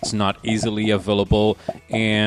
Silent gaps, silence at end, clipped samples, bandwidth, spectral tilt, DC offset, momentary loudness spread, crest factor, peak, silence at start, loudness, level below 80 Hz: none; 0 s; under 0.1%; 11.5 kHz; -5.5 dB/octave; under 0.1%; 5 LU; 14 dB; -6 dBFS; 0 s; -21 LUFS; -36 dBFS